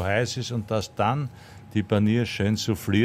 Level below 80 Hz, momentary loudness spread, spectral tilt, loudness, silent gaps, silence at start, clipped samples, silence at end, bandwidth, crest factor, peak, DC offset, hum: -58 dBFS; 8 LU; -6 dB/octave; -25 LUFS; none; 0 s; under 0.1%; 0 s; 15.5 kHz; 16 dB; -8 dBFS; under 0.1%; none